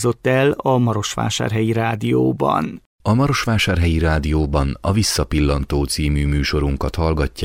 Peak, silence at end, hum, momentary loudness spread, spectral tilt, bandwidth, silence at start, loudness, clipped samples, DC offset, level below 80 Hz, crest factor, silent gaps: -4 dBFS; 0 s; none; 4 LU; -5.5 dB/octave; 16.5 kHz; 0 s; -19 LUFS; under 0.1%; under 0.1%; -26 dBFS; 14 dB; 2.86-2.99 s